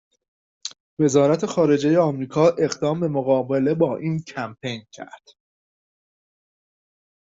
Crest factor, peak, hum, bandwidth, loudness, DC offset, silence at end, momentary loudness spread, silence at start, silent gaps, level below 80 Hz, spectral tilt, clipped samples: 18 dB; -4 dBFS; none; 8 kHz; -21 LUFS; under 0.1%; 2.15 s; 17 LU; 0.65 s; 0.80-0.97 s; -64 dBFS; -6.5 dB/octave; under 0.1%